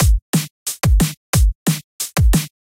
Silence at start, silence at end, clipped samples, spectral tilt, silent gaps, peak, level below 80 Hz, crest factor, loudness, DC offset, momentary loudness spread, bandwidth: 0 s; 0.2 s; under 0.1%; -4.5 dB/octave; 0.22-0.33 s, 0.50-0.66 s, 1.17-1.33 s, 1.55-1.66 s, 1.84-1.99 s; -4 dBFS; -18 dBFS; 12 dB; -18 LUFS; under 0.1%; 6 LU; 17 kHz